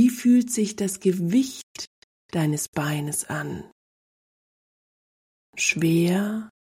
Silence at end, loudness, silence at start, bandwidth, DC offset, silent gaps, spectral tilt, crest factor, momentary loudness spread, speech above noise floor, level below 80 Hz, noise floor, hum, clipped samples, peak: 0.15 s; -24 LUFS; 0 s; 16 kHz; under 0.1%; 1.63-1.75 s, 1.87-2.29 s, 2.68-2.73 s, 3.72-5.53 s; -5 dB/octave; 18 dB; 16 LU; over 67 dB; -64 dBFS; under -90 dBFS; none; under 0.1%; -8 dBFS